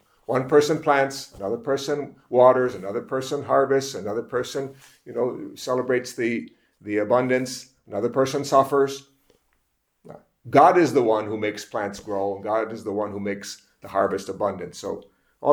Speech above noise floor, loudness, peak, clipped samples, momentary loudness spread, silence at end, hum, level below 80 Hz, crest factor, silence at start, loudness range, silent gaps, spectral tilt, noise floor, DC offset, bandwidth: 49 dB; -23 LUFS; 0 dBFS; under 0.1%; 15 LU; 0 s; none; -64 dBFS; 22 dB; 0.3 s; 6 LU; none; -5 dB/octave; -71 dBFS; under 0.1%; 19 kHz